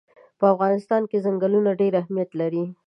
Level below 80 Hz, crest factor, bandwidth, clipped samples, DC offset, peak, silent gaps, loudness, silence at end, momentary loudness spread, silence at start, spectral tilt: -78 dBFS; 18 dB; 5.8 kHz; under 0.1%; under 0.1%; -4 dBFS; none; -22 LUFS; 0.15 s; 6 LU; 0.4 s; -9.5 dB/octave